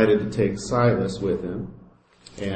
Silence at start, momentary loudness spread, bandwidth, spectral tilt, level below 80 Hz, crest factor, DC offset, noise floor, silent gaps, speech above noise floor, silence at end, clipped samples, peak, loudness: 0 s; 13 LU; 8.8 kHz; -6.5 dB/octave; -48 dBFS; 18 dB; under 0.1%; -51 dBFS; none; 29 dB; 0 s; under 0.1%; -6 dBFS; -24 LUFS